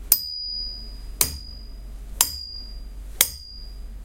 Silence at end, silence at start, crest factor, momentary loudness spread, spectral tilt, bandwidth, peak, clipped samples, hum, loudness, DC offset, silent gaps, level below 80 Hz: 0 s; 0 s; 28 dB; 20 LU; 0 dB/octave; 16.5 kHz; 0 dBFS; under 0.1%; none; -23 LUFS; under 0.1%; none; -38 dBFS